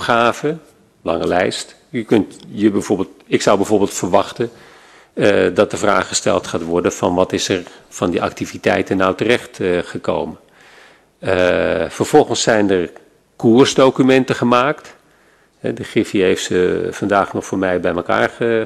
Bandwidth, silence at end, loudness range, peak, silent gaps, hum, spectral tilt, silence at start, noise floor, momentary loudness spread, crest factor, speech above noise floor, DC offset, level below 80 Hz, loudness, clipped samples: 13 kHz; 0 s; 4 LU; 0 dBFS; none; none; -4.5 dB/octave; 0 s; -53 dBFS; 11 LU; 16 dB; 37 dB; under 0.1%; -50 dBFS; -16 LUFS; under 0.1%